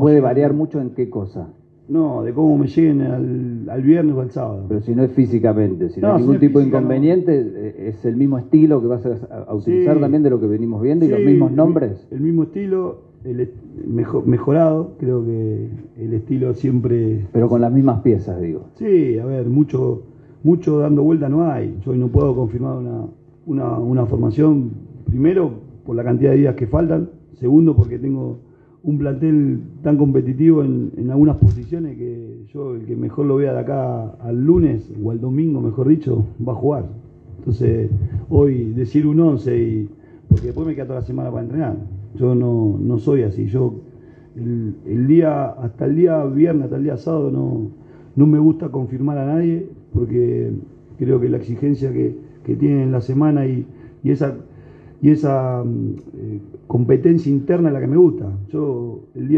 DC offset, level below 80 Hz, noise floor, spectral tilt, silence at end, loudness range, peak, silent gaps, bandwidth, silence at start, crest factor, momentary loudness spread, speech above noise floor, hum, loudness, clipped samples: under 0.1%; -42 dBFS; -42 dBFS; -12 dB/octave; 0 s; 4 LU; 0 dBFS; none; 4.8 kHz; 0 s; 16 dB; 12 LU; 26 dB; none; -18 LUFS; under 0.1%